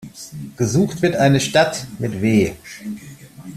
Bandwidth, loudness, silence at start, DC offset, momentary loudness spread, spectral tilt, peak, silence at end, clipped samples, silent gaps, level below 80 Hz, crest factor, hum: 14.5 kHz; -18 LUFS; 0 s; under 0.1%; 18 LU; -5.5 dB/octave; -2 dBFS; 0 s; under 0.1%; none; -50 dBFS; 18 dB; none